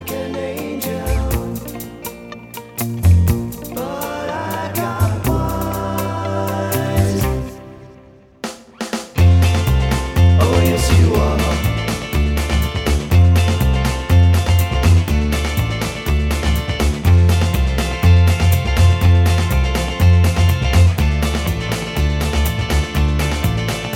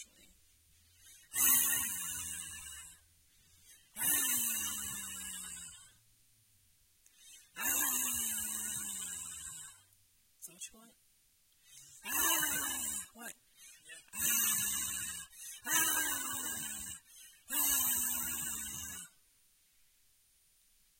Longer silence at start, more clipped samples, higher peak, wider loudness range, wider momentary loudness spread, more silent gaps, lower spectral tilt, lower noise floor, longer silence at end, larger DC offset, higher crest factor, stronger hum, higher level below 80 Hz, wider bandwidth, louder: about the same, 0 s vs 0 s; neither; first, -2 dBFS vs -12 dBFS; about the same, 6 LU vs 6 LU; second, 12 LU vs 22 LU; neither; first, -6 dB/octave vs 0.5 dB/octave; second, -44 dBFS vs -70 dBFS; second, 0 s vs 1.9 s; neither; second, 14 dB vs 28 dB; neither; first, -22 dBFS vs -68 dBFS; about the same, 17.5 kHz vs 16.5 kHz; first, -17 LUFS vs -33 LUFS